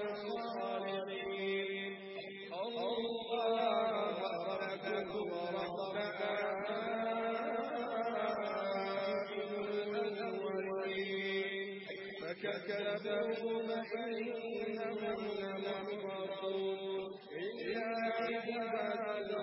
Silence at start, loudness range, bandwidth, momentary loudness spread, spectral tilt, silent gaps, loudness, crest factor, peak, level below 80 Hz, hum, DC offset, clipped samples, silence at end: 0 s; 3 LU; 5.6 kHz; 5 LU; -2.5 dB/octave; none; -39 LUFS; 16 dB; -22 dBFS; -80 dBFS; none; under 0.1%; under 0.1%; 0 s